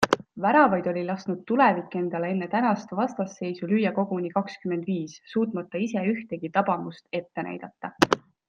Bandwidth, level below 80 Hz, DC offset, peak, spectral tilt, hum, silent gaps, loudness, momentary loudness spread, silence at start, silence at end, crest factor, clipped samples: 13 kHz; -64 dBFS; under 0.1%; -2 dBFS; -6 dB/octave; none; none; -26 LUFS; 11 LU; 0 s; 0.3 s; 24 dB; under 0.1%